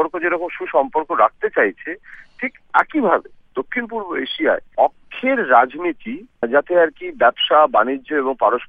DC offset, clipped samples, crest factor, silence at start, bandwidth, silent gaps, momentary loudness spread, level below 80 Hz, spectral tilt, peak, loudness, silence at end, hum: under 0.1%; under 0.1%; 18 dB; 0 s; 5 kHz; none; 13 LU; -56 dBFS; -6 dB/octave; 0 dBFS; -18 LUFS; 0.05 s; none